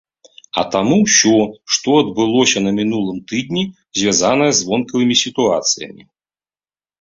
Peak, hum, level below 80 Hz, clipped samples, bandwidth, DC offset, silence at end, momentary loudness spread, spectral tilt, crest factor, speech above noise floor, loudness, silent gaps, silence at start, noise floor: 0 dBFS; none; -54 dBFS; under 0.1%; 7.8 kHz; under 0.1%; 1.1 s; 10 LU; -3 dB/octave; 16 dB; over 75 dB; -15 LUFS; none; 0.55 s; under -90 dBFS